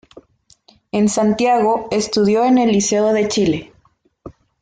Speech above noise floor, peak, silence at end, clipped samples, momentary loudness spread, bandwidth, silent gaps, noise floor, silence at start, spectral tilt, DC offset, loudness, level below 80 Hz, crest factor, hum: 42 dB; -4 dBFS; 0.3 s; under 0.1%; 5 LU; 9.4 kHz; none; -58 dBFS; 0.95 s; -4.5 dB/octave; under 0.1%; -16 LUFS; -52 dBFS; 12 dB; none